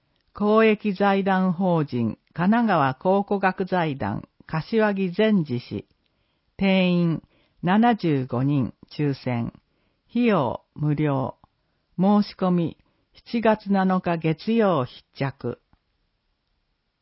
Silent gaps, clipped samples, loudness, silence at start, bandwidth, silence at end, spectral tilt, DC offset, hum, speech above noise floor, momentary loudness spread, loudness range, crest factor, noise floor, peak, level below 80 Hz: none; under 0.1%; -23 LUFS; 0.35 s; 5.8 kHz; 1.45 s; -11.5 dB/octave; under 0.1%; none; 51 dB; 11 LU; 3 LU; 18 dB; -73 dBFS; -6 dBFS; -58 dBFS